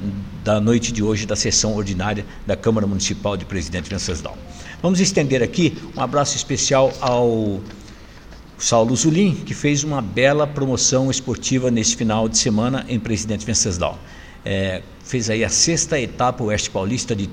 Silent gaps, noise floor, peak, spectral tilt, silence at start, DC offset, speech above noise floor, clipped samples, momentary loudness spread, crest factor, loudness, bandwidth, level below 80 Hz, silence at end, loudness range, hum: none; -40 dBFS; -2 dBFS; -4 dB/octave; 0 s; under 0.1%; 21 dB; under 0.1%; 9 LU; 18 dB; -19 LUFS; 15.5 kHz; -40 dBFS; 0 s; 3 LU; none